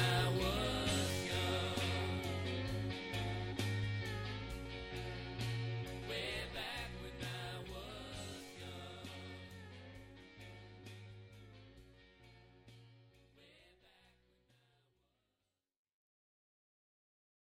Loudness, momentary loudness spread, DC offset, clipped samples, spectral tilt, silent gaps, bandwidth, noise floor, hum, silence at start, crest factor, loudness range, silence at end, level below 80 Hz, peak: -41 LUFS; 22 LU; under 0.1%; under 0.1%; -4.5 dB/octave; none; 16.5 kHz; -89 dBFS; none; 0 s; 22 dB; 20 LU; 3.75 s; -56 dBFS; -22 dBFS